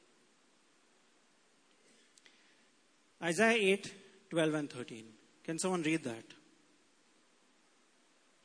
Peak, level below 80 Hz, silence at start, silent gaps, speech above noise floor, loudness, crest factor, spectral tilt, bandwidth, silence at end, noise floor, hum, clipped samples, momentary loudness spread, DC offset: -14 dBFS; -86 dBFS; 3.2 s; none; 37 dB; -34 LUFS; 26 dB; -4 dB/octave; 11 kHz; 2.1 s; -71 dBFS; none; under 0.1%; 21 LU; under 0.1%